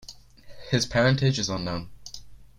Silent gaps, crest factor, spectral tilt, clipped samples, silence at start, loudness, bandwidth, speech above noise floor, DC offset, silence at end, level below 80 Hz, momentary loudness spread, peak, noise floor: none; 18 dB; -5 dB/octave; under 0.1%; 0.05 s; -25 LUFS; 11 kHz; 21 dB; under 0.1%; 0.15 s; -50 dBFS; 21 LU; -8 dBFS; -45 dBFS